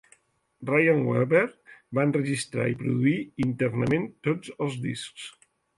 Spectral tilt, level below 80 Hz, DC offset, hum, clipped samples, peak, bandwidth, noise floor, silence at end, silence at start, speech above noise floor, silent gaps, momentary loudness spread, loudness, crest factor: -6.5 dB/octave; -62 dBFS; under 0.1%; none; under 0.1%; -8 dBFS; 11.5 kHz; -63 dBFS; 0.5 s; 0.6 s; 37 dB; none; 11 LU; -26 LUFS; 18 dB